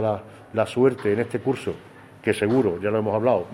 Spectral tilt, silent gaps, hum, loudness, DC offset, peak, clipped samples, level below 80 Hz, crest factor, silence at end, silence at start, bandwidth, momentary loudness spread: -7 dB/octave; none; none; -23 LUFS; under 0.1%; -4 dBFS; under 0.1%; -60 dBFS; 18 dB; 0 s; 0 s; 13 kHz; 9 LU